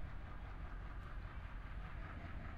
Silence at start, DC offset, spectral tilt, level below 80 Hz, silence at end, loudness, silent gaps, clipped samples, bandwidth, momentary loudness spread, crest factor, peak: 0 s; under 0.1%; -7.5 dB/octave; -50 dBFS; 0 s; -52 LUFS; none; under 0.1%; 6.2 kHz; 2 LU; 10 dB; -38 dBFS